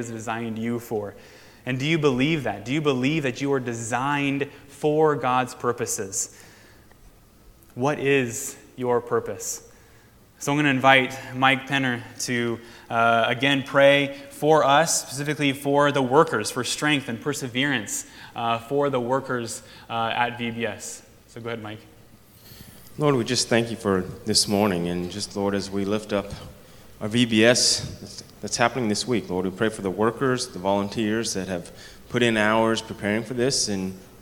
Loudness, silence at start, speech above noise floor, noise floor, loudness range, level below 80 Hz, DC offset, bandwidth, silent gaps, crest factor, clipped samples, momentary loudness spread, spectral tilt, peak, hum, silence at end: -23 LUFS; 0 s; 29 dB; -53 dBFS; 7 LU; -56 dBFS; under 0.1%; 18.5 kHz; none; 24 dB; under 0.1%; 13 LU; -4 dB/octave; 0 dBFS; none; 0.05 s